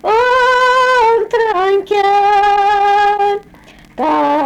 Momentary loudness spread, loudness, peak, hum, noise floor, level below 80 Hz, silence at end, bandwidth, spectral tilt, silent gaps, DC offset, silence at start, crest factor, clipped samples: 6 LU; -12 LUFS; -6 dBFS; none; -41 dBFS; -46 dBFS; 0 s; 11.5 kHz; -3 dB/octave; none; under 0.1%; 0.05 s; 6 dB; under 0.1%